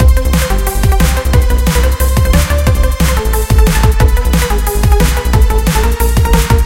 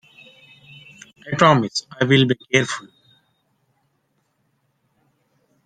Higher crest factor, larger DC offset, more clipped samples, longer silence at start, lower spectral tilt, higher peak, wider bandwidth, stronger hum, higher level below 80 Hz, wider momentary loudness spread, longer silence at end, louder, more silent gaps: second, 10 dB vs 22 dB; first, 0.5% vs under 0.1%; first, 0.3% vs under 0.1%; second, 0 s vs 1.25 s; about the same, -5 dB/octave vs -5 dB/octave; about the same, 0 dBFS vs -2 dBFS; first, 17 kHz vs 9.6 kHz; neither; first, -10 dBFS vs -62 dBFS; second, 3 LU vs 17 LU; second, 0 s vs 2.85 s; first, -12 LUFS vs -18 LUFS; neither